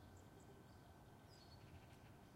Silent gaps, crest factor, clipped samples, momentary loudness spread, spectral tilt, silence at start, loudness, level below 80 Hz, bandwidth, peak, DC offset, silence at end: none; 12 dB; under 0.1%; 2 LU; -5.5 dB/octave; 0 s; -64 LUFS; -74 dBFS; 16 kHz; -50 dBFS; under 0.1%; 0 s